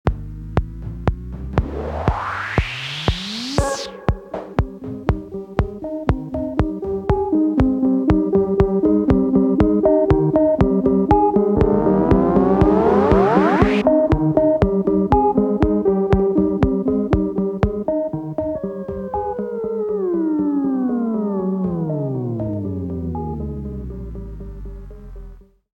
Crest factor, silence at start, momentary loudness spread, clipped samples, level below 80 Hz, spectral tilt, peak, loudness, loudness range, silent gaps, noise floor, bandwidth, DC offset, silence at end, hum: 18 dB; 0.05 s; 12 LU; under 0.1%; -30 dBFS; -8 dB/octave; 0 dBFS; -19 LUFS; 9 LU; none; -41 dBFS; 10.5 kHz; under 0.1%; 0.3 s; none